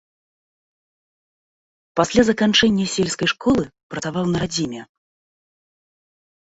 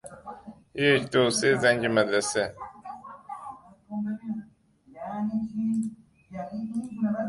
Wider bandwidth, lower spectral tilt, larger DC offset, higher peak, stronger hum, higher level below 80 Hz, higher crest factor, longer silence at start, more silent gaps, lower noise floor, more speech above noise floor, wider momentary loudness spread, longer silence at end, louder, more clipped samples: second, 8.2 kHz vs 11.5 kHz; about the same, -4.5 dB/octave vs -4 dB/octave; neither; first, -2 dBFS vs -8 dBFS; neither; first, -50 dBFS vs -62 dBFS; about the same, 20 dB vs 20 dB; first, 1.95 s vs 0.05 s; first, 3.83-3.90 s vs none; first, under -90 dBFS vs -57 dBFS; first, over 71 dB vs 34 dB; second, 13 LU vs 21 LU; first, 1.75 s vs 0 s; first, -19 LUFS vs -26 LUFS; neither